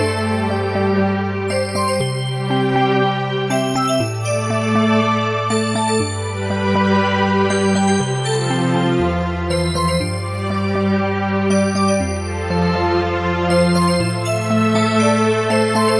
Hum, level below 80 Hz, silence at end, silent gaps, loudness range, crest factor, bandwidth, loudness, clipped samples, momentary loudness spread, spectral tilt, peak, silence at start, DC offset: none; -44 dBFS; 0 s; none; 2 LU; 14 dB; 11.5 kHz; -18 LUFS; under 0.1%; 5 LU; -5.5 dB/octave; -4 dBFS; 0 s; under 0.1%